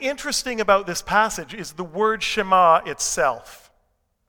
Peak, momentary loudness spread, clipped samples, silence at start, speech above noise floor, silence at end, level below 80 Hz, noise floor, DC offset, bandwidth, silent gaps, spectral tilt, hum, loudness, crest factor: -2 dBFS; 15 LU; under 0.1%; 0 s; 47 dB; 0.7 s; -50 dBFS; -68 dBFS; under 0.1%; 19.5 kHz; none; -2 dB/octave; none; -20 LUFS; 18 dB